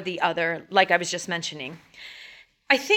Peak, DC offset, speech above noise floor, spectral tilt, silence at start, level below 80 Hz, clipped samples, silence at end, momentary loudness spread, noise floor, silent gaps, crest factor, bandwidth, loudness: -4 dBFS; under 0.1%; 24 dB; -2.5 dB/octave; 0 s; -72 dBFS; under 0.1%; 0 s; 22 LU; -48 dBFS; none; 22 dB; 17 kHz; -24 LUFS